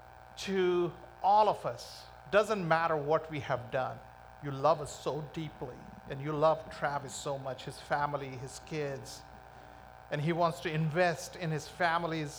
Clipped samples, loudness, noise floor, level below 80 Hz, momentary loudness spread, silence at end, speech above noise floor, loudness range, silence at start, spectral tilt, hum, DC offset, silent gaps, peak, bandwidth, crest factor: under 0.1%; -33 LUFS; -52 dBFS; -62 dBFS; 18 LU; 0 s; 20 dB; 6 LU; 0 s; -5.5 dB/octave; none; under 0.1%; none; -14 dBFS; over 20 kHz; 20 dB